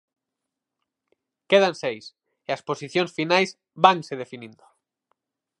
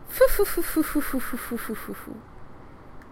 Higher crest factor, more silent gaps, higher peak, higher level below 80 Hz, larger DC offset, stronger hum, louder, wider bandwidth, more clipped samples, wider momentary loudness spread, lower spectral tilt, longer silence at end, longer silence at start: about the same, 24 dB vs 20 dB; neither; first, -2 dBFS vs -6 dBFS; second, -80 dBFS vs -38 dBFS; neither; neither; first, -22 LUFS vs -26 LUFS; second, 11 kHz vs 16 kHz; neither; about the same, 19 LU vs 18 LU; about the same, -4.5 dB/octave vs -4 dB/octave; first, 1.1 s vs 0 s; first, 1.5 s vs 0 s